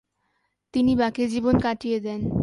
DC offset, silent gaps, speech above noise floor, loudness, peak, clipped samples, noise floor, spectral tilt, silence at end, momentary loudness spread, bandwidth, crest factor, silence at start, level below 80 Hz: under 0.1%; none; 51 dB; -24 LUFS; -6 dBFS; under 0.1%; -73 dBFS; -7 dB/octave; 0 s; 6 LU; 11 kHz; 18 dB; 0.75 s; -44 dBFS